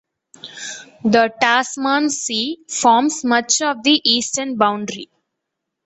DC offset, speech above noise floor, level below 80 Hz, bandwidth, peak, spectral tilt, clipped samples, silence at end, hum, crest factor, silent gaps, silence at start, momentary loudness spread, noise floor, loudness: under 0.1%; 62 dB; -64 dBFS; 8.2 kHz; 0 dBFS; -2 dB/octave; under 0.1%; 0.8 s; none; 18 dB; none; 0.45 s; 16 LU; -79 dBFS; -17 LUFS